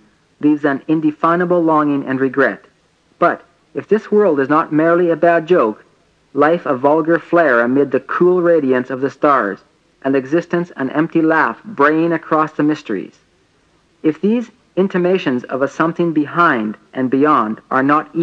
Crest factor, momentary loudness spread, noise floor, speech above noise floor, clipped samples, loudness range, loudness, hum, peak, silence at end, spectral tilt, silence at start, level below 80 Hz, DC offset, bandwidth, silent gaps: 16 dB; 8 LU; -56 dBFS; 42 dB; under 0.1%; 4 LU; -15 LUFS; none; 0 dBFS; 0 s; -8 dB/octave; 0.4 s; -66 dBFS; under 0.1%; 7.4 kHz; none